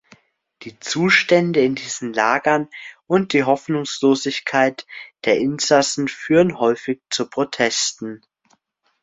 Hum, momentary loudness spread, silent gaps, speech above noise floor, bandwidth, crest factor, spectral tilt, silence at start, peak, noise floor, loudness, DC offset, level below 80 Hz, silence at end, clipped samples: none; 17 LU; none; 45 dB; 8.4 kHz; 18 dB; -4 dB/octave; 0.6 s; -2 dBFS; -64 dBFS; -19 LUFS; under 0.1%; -62 dBFS; 0.85 s; under 0.1%